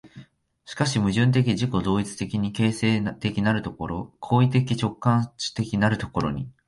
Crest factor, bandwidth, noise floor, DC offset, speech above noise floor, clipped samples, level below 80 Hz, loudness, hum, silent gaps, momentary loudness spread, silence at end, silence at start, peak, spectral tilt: 18 dB; 11.5 kHz; -51 dBFS; under 0.1%; 27 dB; under 0.1%; -48 dBFS; -24 LUFS; none; none; 9 LU; 0.15 s; 0.05 s; -6 dBFS; -6 dB/octave